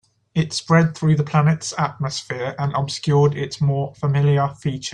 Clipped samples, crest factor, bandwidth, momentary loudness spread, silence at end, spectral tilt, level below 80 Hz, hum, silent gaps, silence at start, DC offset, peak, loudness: under 0.1%; 16 dB; 10 kHz; 8 LU; 0 s; -6 dB/octave; -54 dBFS; none; none; 0.35 s; under 0.1%; -4 dBFS; -20 LUFS